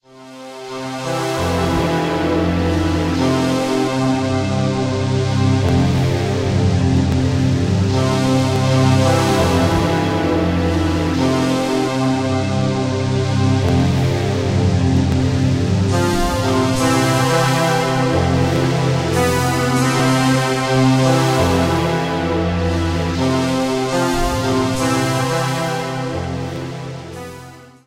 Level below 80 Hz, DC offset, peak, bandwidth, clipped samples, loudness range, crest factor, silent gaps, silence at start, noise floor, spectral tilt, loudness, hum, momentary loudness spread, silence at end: -34 dBFS; under 0.1%; -2 dBFS; 16 kHz; under 0.1%; 3 LU; 14 dB; none; 0.15 s; -38 dBFS; -6 dB/octave; -17 LUFS; none; 6 LU; 0.2 s